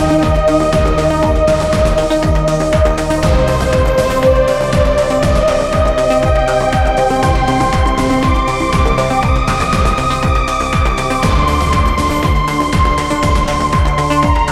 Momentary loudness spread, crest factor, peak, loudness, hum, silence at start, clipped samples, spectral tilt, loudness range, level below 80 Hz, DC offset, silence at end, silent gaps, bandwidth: 2 LU; 12 dB; 0 dBFS; -13 LUFS; none; 0 s; under 0.1%; -6 dB/octave; 1 LU; -18 dBFS; 0.2%; 0 s; none; 14.5 kHz